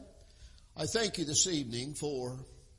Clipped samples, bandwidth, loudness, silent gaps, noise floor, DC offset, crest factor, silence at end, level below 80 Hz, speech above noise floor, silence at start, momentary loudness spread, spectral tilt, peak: under 0.1%; 11.5 kHz; -33 LUFS; none; -56 dBFS; under 0.1%; 20 dB; 0.05 s; -58 dBFS; 22 dB; 0 s; 15 LU; -2.5 dB/octave; -16 dBFS